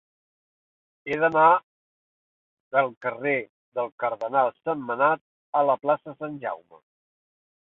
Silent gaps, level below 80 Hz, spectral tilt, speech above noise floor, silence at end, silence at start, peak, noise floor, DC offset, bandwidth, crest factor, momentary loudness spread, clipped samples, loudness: 1.63-2.71 s, 2.97-3.01 s, 3.49-3.72 s, 3.92-3.98 s, 5.21-5.53 s; -74 dBFS; -7.5 dB/octave; over 66 dB; 1.15 s; 1.05 s; -4 dBFS; under -90 dBFS; under 0.1%; 6.2 kHz; 22 dB; 14 LU; under 0.1%; -25 LUFS